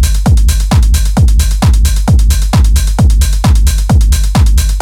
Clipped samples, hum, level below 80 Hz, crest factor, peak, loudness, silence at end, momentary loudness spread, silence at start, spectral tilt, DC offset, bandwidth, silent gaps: under 0.1%; none; -8 dBFS; 6 dB; 0 dBFS; -10 LUFS; 0 s; 1 LU; 0 s; -5 dB/octave; under 0.1%; 16.5 kHz; none